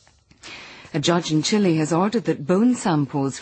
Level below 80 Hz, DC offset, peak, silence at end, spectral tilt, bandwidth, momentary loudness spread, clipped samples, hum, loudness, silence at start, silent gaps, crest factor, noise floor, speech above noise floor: -60 dBFS; under 0.1%; -6 dBFS; 0 s; -5.5 dB/octave; 8.8 kHz; 18 LU; under 0.1%; none; -21 LUFS; 0.45 s; none; 14 dB; -46 dBFS; 26 dB